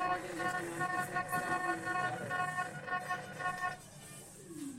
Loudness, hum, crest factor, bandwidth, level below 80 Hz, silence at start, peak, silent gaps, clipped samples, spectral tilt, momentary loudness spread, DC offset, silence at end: -37 LUFS; none; 18 dB; 16 kHz; -68 dBFS; 0 s; -20 dBFS; none; under 0.1%; -4 dB/octave; 14 LU; under 0.1%; 0 s